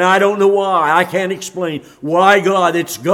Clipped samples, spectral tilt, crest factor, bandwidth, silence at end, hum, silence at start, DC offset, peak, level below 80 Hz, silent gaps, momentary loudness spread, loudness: under 0.1%; -4.5 dB/octave; 14 dB; 16.5 kHz; 0 s; none; 0 s; under 0.1%; 0 dBFS; -62 dBFS; none; 11 LU; -14 LUFS